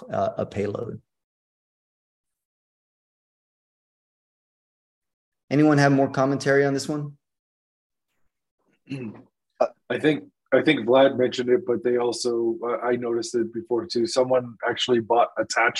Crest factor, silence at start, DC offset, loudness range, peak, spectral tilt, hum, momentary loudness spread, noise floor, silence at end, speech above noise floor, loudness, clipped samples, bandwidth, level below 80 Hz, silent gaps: 20 dB; 0 s; under 0.1%; 11 LU; -6 dBFS; -5.5 dB/octave; none; 12 LU; -73 dBFS; 0 s; 50 dB; -23 LUFS; under 0.1%; 12 kHz; -68 dBFS; 1.24-2.24 s, 2.45-5.02 s, 5.14-5.32 s, 5.44-5.48 s, 7.39-7.90 s, 8.51-8.58 s